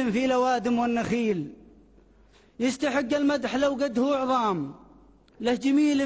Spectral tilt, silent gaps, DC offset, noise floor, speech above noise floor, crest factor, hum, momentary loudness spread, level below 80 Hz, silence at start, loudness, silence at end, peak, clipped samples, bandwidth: -5 dB/octave; none; under 0.1%; -57 dBFS; 33 dB; 12 dB; none; 7 LU; -58 dBFS; 0 s; -25 LUFS; 0 s; -14 dBFS; under 0.1%; 8 kHz